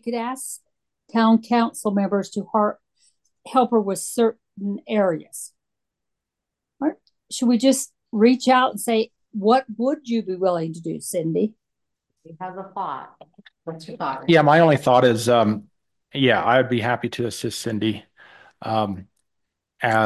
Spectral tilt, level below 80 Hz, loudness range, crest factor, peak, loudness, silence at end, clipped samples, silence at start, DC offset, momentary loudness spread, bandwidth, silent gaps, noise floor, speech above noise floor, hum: -5 dB/octave; -62 dBFS; 8 LU; 18 dB; -4 dBFS; -21 LUFS; 0 s; under 0.1%; 0.05 s; under 0.1%; 17 LU; 12.5 kHz; none; -84 dBFS; 63 dB; none